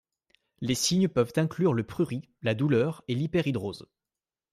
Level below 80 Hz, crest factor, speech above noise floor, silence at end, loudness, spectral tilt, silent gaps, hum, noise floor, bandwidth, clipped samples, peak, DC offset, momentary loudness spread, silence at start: -62 dBFS; 16 dB; over 63 dB; 0.7 s; -28 LUFS; -5.5 dB/octave; none; none; under -90 dBFS; 15 kHz; under 0.1%; -12 dBFS; under 0.1%; 8 LU; 0.6 s